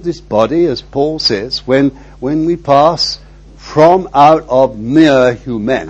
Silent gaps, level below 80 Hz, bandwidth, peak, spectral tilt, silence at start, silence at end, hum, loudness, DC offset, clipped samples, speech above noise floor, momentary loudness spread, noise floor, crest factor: none; -38 dBFS; 8.2 kHz; 0 dBFS; -6 dB/octave; 0 s; 0 s; none; -11 LUFS; under 0.1%; 0.5%; 22 dB; 9 LU; -33 dBFS; 12 dB